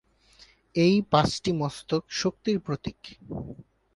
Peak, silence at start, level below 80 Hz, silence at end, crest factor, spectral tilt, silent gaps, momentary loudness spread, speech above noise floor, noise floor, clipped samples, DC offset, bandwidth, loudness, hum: -6 dBFS; 0.75 s; -54 dBFS; 0.35 s; 22 dB; -5.5 dB/octave; none; 16 LU; 31 dB; -57 dBFS; under 0.1%; under 0.1%; 11.5 kHz; -26 LUFS; none